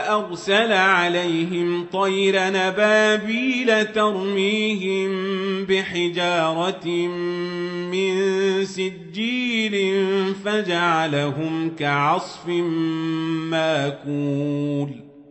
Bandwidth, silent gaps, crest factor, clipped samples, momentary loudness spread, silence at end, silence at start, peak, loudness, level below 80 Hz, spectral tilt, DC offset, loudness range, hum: 8.4 kHz; none; 18 dB; under 0.1%; 8 LU; 0.1 s; 0 s; -4 dBFS; -21 LUFS; -66 dBFS; -5 dB/octave; under 0.1%; 4 LU; none